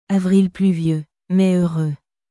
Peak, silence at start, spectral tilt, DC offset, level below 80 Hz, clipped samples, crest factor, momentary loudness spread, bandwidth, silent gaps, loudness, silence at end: -6 dBFS; 0.1 s; -8.5 dB/octave; under 0.1%; -56 dBFS; under 0.1%; 12 dB; 10 LU; 11.5 kHz; none; -18 LUFS; 0.35 s